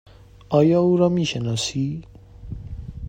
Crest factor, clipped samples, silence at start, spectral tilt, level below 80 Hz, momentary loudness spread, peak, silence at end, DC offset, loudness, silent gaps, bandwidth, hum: 18 dB; under 0.1%; 0.5 s; -6 dB/octave; -42 dBFS; 19 LU; -4 dBFS; 0 s; under 0.1%; -20 LUFS; none; 9.8 kHz; none